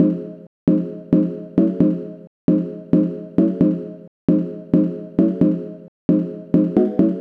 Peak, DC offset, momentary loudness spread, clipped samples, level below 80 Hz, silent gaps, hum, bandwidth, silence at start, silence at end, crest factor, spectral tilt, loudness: -2 dBFS; under 0.1%; 10 LU; under 0.1%; -52 dBFS; 0.47-0.67 s, 2.27-2.48 s, 4.08-4.28 s, 5.88-6.09 s; none; 3.6 kHz; 0 s; 0 s; 18 dB; -12 dB/octave; -19 LUFS